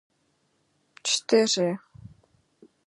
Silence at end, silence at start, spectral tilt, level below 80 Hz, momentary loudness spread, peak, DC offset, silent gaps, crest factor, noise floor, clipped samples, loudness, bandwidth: 0.8 s; 1.05 s; -3 dB/octave; -68 dBFS; 11 LU; -8 dBFS; under 0.1%; none; 22 dB; -71 dBFS; under 0.1%; -24 LUFS; 11.5 kHz